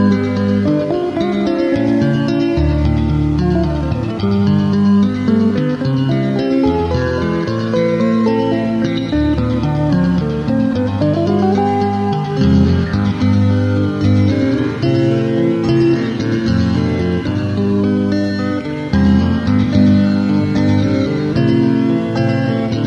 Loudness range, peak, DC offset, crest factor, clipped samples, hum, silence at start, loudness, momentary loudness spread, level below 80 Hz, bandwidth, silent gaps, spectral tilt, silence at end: 2 LU; -2 dBFS; under 0.1%; 12 dB; under 0.1%; none; 0 s; -15 LUFS; 4 LU; -30 dBFS; 8 kHz; none; -8.5 dB/octave; 0 s